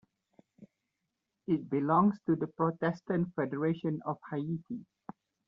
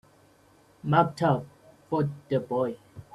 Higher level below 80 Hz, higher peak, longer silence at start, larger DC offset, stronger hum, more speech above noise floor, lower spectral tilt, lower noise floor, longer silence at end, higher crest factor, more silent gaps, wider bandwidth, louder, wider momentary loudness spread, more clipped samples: second, -72 dBFS vs -64 dBFS; second, -14 dBFS vs -6 dBFS; second, 0.6 s vs 0.85 s; neither; neither; first, 54 dB vs 34 dB; about the same, -8 dB/octave vs -8 dB/octave; first, -85 dBFS vs -59 dBFS; first, 0.65 s vs 0.1 s; about the same, 20 dB vs 24 dB; neither; second, 6.4 kHz vs 11.5 kHz; second, -32 LUFS vs -27 LUFS; first, 17 LU vs 14 LU; neither